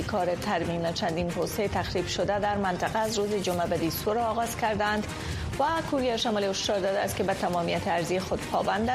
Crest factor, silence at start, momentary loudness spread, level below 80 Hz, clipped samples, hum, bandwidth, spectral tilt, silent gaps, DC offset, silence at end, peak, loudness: 14 dB; 0 s; 3 LU; -46 dBFS; under 0.1%; none; 15 kHz; -4.5 dB/octave; none; under 0.1%; 0 s; -14 dBFS; -28 LUFS